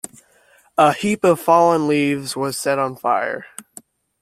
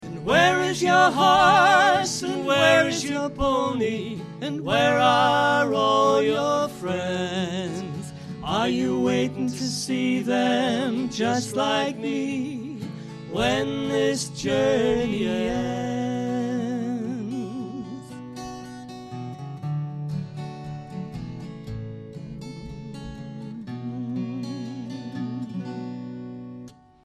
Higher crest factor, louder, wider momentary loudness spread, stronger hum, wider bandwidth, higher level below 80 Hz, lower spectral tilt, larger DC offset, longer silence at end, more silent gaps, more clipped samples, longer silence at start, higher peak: about the same, 18 dB vs 20 dB; first, -18 LUFS vs -23 LUFS; second, 15 LU vs 19 LU; neither; first, 16 kHz vs 14 kHz; second, -60 dBFS vs -50 dBFS; about the same, -5 dB/octave vs -4.5 dB/octave; neither; first, 0.6 s vs 0.3 s; neither; neither; first, 0.8 s vs 0 s; first, -2 dBFS vs -6 dBFS